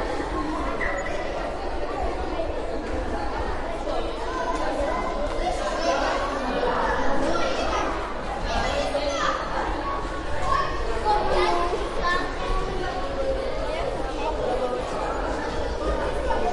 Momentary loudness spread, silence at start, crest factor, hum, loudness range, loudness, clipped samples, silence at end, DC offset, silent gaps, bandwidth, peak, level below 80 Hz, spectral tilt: 6 LU; 0 s; 16 dB; none; 4 LU; -27 LUFS; under 0.1%; 0 s; under 0.1%; none; 11.5 kHz; -8 dBFS; -32 dBFS; -5 dB/octave